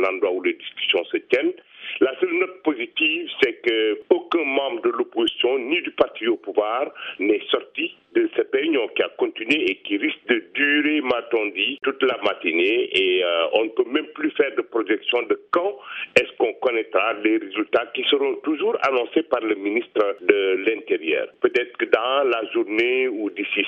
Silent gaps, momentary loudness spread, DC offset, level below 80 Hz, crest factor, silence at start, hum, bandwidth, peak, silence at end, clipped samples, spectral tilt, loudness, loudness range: none; 5 LU; under 0.1%; -68 dBFS; 22 dB; 0 s; none; 8.4 kHz; 0 dBFS; 0 s; under 0.1%; -4.5 dB/octave; -22 LUFS; 2 LU